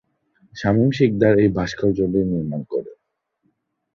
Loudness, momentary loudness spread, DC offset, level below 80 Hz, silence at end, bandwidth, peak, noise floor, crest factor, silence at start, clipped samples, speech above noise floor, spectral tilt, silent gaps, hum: -20 LUFS; 12 LU; under 0.1%; -46 dBFS; 1 s; 7.2 kHz; -2 dBFS; -73 dBFS; 18 dB; 0.55 s; under 0.1%; 55 dB; -8 dB/octave; none; none